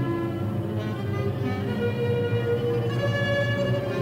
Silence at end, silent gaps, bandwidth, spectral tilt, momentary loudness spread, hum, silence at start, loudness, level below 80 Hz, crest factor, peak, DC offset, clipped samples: 0 s; none; 16 kHz; -7.5 dB/octave; 5 LU; none; 0 s; -26 LUFS; -50 dBFS; 12 dB; -14 dBFS; under 0.1%; under 0.1%